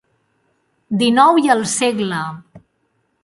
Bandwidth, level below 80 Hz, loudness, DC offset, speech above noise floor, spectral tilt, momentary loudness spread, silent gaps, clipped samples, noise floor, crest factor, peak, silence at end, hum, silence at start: 11.5 kHz; -62 dBFS; -15 LUFS; under 0.1%; 51 dB; -4 dB/octave; 14 LU; none; under 0.1%; -66 dBFS; 18 dB; 0 dBFS; 0.65 s; none; 0.9 s